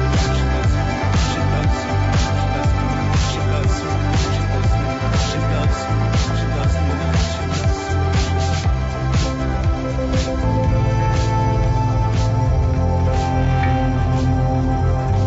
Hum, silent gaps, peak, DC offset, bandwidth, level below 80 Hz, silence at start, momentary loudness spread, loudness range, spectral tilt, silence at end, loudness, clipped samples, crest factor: none; none; -8 dBFS; under 0.1%; 8 kHz; -24 dBFS; 0 s; 2 LU; 1 LU; -6 dB/octave; 0 s; -19 LUFS; under 0.1%; 10 dB